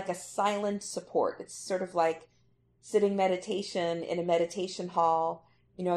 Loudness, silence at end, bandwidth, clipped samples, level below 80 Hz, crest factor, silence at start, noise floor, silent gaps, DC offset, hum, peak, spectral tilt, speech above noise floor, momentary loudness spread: -31 LUFS; 0 s; 13 kHz; under 0.1%; -74 dBFS; 18 dB; 0 s; -67 dBFS; none; under 0.1%; none; -14 dBFS; -4.5 dB/octave; 37 dB; 8 LU